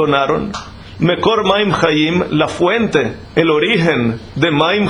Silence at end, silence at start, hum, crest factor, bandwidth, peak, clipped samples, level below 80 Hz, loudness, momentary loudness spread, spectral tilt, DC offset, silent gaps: 0 s; 0 s; none; 14 dB; 10.5 kHz; 0 dBFS; under 0.1%; -42 dBFS; -14 LUFS; 6 LU; -6 dB/octave; under 0.1%; none